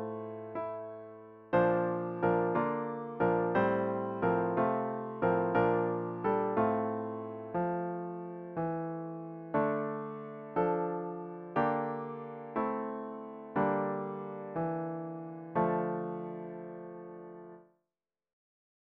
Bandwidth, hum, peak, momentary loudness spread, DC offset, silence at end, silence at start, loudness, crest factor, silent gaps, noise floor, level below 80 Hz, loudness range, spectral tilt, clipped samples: 4.9 kHz; none; -16 dBFS; 14 LU; under 0.1%; 1.2 s; 0 s; -34 LUFS; 18 dB; none; under -90 dBFS; -68 dBFS; 6 LU; -7.5 dB/octave; under 0.1%